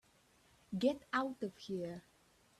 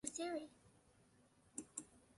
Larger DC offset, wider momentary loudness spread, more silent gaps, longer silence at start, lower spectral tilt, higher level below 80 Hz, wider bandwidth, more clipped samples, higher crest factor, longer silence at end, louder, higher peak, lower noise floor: neither; about the same, 11 LU vs 10 LU; neither; first, 0.7 s vs 0.05 s; first, -6 dB/octave vs -2.5 dB/octave; about the same, -76 dBFS vs -80 dBFS; first, 13.5 kHz vs 11.5 kHz; neither; about the same, 20 dB vs 24 dB; first, 0.6 s vs 0.15 s; first, -40 LUFS vs -49 LUFS; first, -20 dBFS vs -28 dBFS; about the same, -70 dBFS vs -73 dBFS